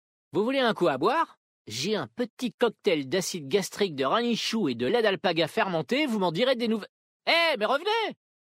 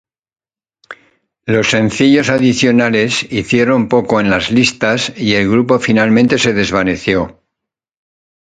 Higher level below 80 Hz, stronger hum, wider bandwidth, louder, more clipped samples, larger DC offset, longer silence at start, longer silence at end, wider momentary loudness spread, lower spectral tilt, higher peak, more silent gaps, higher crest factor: second, -72 dBFS vs -44 dBFS; neither; first, 16 kHz vs 9.4 kHz; second, -27 LUFS vs -12 LUFS; neither; neither; second, 0.35 s vs 0.9 s; second, 0.4 s vs 1.15 s; first, 8 LU vs 5 LU; about the same, -4 dB/octave vs -5 dB/octave; second, -10 dBFS vs 0 dBFS; first, 1.37-1.65 s, 2.30-2.37 s, 2.54-2.58 s, 6.89-7.20 s vs none; about the same, 18 dB vs 14 dB